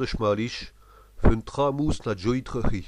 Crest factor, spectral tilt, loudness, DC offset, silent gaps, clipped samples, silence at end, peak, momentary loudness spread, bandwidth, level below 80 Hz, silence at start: 20 dB; -6.5 dB/octave; -27 LUFS; under 0.1%; none; under 0.1%; 0 s; -4 dBFS; 7 LU; 10 kHz; -32 dBFS; 0 s